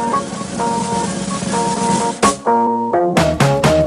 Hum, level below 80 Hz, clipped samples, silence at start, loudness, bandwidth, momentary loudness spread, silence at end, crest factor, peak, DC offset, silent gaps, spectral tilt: none; -38 dBFS; under 0.1%; 0 s; -16 LUFS; 14.5 kHz; 7 LU; 0 s; 14 dB; -2 dBFS; under 0.1%; none; -5 dB/octave